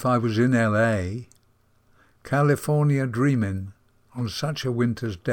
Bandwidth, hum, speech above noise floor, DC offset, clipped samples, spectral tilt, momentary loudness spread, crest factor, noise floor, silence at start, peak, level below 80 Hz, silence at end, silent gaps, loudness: 18 kHz; none; 40 dB; under 0.1%; under 0.1%; -7 dB/octave; 12 LU; 14 dB; -62 dBFS; 0 s; -10 dBFS; -58 dBFS; 0 s; none; -23 LUFS